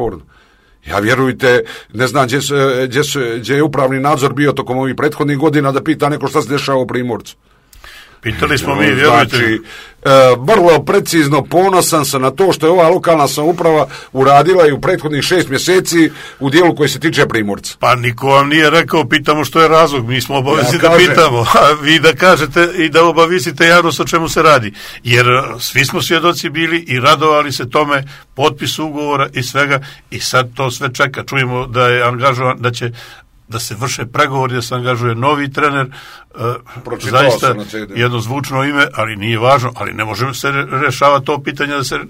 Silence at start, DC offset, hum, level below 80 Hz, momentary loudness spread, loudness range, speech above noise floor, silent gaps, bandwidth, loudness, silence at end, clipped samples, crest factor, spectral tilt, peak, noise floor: 0 s; under 0.1%; none; -42 dBFS; 10 LU; 6 LU; 26 dB; none; 16.5 kHz; -12 LUFS; 0 s; 0.2%; 12 dB; -4.5 dB/octave; 0 dBFS; -38 dBFS